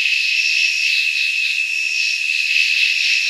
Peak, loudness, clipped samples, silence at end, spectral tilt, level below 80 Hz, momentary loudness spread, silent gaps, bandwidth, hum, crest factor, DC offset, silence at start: -4 dBFS; -15 LUFS; under 0.1%; 0 s; 15 dB/octave; under -90 dBFS; 3 LU; none; 15 kHz; none; 14 dB; under 0.1%; 0 s